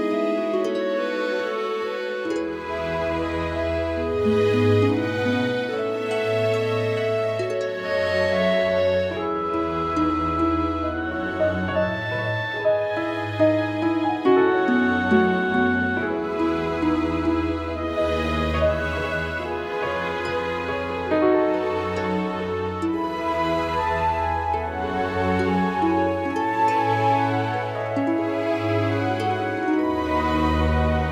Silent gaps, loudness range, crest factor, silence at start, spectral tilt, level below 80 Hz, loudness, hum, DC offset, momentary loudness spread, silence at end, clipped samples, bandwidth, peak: none; 4 LU; 16 dB; 0 s; -7 dB/octave; -40 dBFS; -23 LUFS; none; under 0.1%; 6 LU; 0 s; under 0.1%; 13 kHz; -6 dBFS